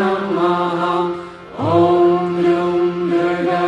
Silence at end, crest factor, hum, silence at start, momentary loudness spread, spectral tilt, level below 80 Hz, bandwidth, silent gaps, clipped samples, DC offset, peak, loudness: 0 s; 14 dB; none; 0 s; 9 LU; -7.5 dB/octave; -56 dBFS; 7.8 kHz; none; under 0.1%; under 0.1%; -2 dBFS; -17 LUFS